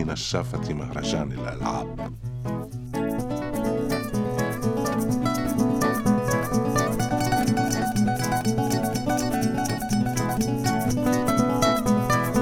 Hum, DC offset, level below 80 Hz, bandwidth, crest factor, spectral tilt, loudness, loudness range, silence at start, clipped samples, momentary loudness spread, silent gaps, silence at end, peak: none; under 0.1%; -42 dBFS; 20 kHz; 16 dB; -5.5 dB/octave; -25 LUFS; 5 LU; 0 s; under 0.1%; 7 LU; none; 0 s; -8 dBFS